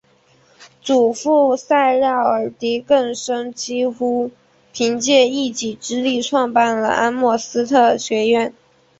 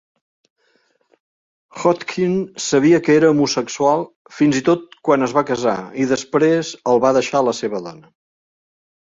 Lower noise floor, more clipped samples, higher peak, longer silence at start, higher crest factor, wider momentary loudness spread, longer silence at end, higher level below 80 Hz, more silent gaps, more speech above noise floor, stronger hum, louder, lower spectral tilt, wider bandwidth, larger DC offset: second, -55 dBFS vs -62 dBFS; neither; about the same, -2 dBFS vs -2 dBFS; second, 0.6 s vs 1.75 s; about the same, 16 dB vs 16 dB; about the same, 9 LU vs 8 LU; second, 0.5 s vs 1.1 s; about the same, -62 dBFS vs -60 dBFS; second, none vs 4.16-4.25 s; second, 38 dB vs 45 dB; neither; about the same, -17 LUFS vs -17 LUFS; second, -3 dB/octave vs -5 dB/octave; about the same, 8.2 kHz vs 7.8 kHz; neither